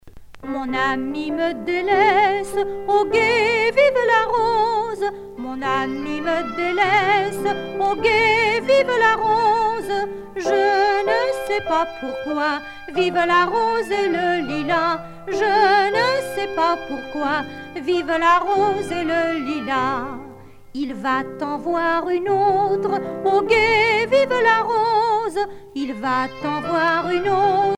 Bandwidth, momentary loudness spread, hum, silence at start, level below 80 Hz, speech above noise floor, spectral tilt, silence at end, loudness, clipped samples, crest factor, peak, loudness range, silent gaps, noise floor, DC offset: 15.5 kHz; 11 LU; none; 0.05 s; -50 dBFS; 21 dB; -4.5 dB/octave; 0 s; -19 LUFS; under 0.1%; 16 dB; -4 dBFS; 4 LU; none; -40 dBFS; under 0.1%